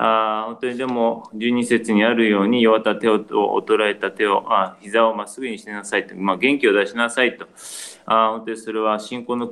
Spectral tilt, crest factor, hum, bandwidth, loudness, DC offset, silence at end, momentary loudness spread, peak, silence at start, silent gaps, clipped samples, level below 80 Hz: -4.5 dB/octave; 18 dB; none; 12.5 kHz; -19 LUFS; under 0.1%; 0 s; 12 LU; -2 dBFS; 0 s; none; under 0.1%; -68 dBFS